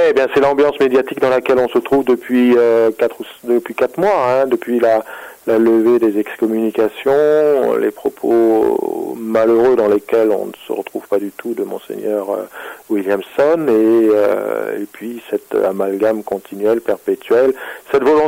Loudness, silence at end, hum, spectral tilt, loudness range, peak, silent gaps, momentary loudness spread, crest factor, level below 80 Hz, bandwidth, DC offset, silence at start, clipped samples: -15 LUFS; 0 s; none; -6 dB/octave; 4 LU; -6 dBFS; none; 12 LU; 10 dB; -56 dBFS; 16 kHz; under 0.1%; 0 s; under 0.1%